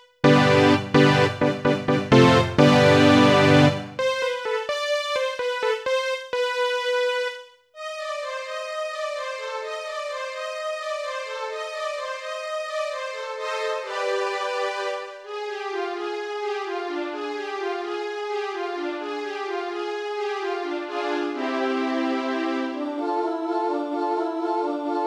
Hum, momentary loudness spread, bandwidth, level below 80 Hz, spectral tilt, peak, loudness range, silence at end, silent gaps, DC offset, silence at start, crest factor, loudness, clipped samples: none; 14 LU; 13.5 kHz; -58 dBFS; -5.5 dB/octave; 0 dBFS; 12 LU; 0 s; none; under 0.1%; 0.25 s; 22 dB; -23 LUFS; under 0.1%